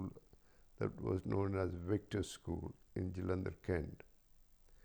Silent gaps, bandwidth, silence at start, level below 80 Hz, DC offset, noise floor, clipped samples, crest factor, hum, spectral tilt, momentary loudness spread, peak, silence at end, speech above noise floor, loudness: none; over 20 kHz; 0 s; -58 dBFS; under 0.1%; -66 dBFS; under 0.1%; 18 dB; none; -7 dB/octave; 9 LU; -24 dBFS; 0.1 s; 26 dB; -42 LUFS